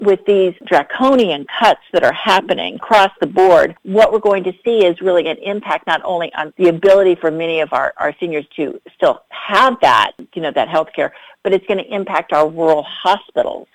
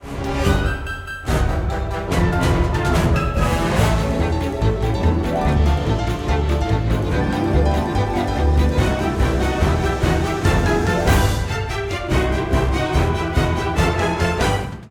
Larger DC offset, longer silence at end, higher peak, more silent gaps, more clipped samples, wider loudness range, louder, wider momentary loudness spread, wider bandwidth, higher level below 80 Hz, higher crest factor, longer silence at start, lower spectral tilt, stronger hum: neither; about the same, 0.1 s vs 0 s; about the same, -2 dBFS vs -4 dBFS; neither; neither; about the same, 3 LU vs 1 LU; first, -15 LUFS vs -19 LUFS; first, 10 LU vs 5 LU; second, 14.5 kHz vs 17 kHz; second, -54 dBFS vs -24 dBFS; about the same, 12 dB vs 14 dB; about the same, 0 s vs 0 s; about the same, -5 dB/octave vs -6 dB/octave; neither